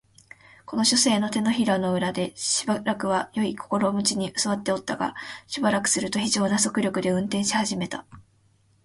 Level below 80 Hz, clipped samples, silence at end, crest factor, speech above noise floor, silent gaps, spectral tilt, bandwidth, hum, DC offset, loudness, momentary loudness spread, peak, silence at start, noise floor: -62 dBFS; under 0.1%; 0.65 s; 18 dB; 38 dB; none; -3.5 dB/octave; 11.5 kHz; none; under 0.1%; -24 LUFS; 8 LU; -8 dBFS; 0.7 s; -62 dBFS